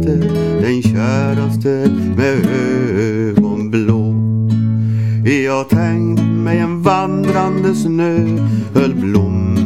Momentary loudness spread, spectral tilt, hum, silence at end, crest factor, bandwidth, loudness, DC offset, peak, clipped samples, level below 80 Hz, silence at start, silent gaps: 2 LU; -8 dB/octave; none; 0 s; 14 dB; 14 kHz; -15 LUFS; 0.7%; 0 dBFS; under 0.1%; -42 dBFS; 0 s; none